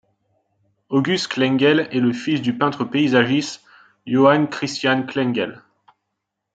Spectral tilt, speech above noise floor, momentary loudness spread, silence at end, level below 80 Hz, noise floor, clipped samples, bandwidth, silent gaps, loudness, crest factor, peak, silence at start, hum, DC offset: -5.5 dB/octave; 60 dB; 8 LU; 0.95 s; -66 dBFS; -79 dBFS; under 0.1%; 9 kHz; none; -19 LUFS; 18 dB; -2 dBFS; 0.9 s; none; under 0.1%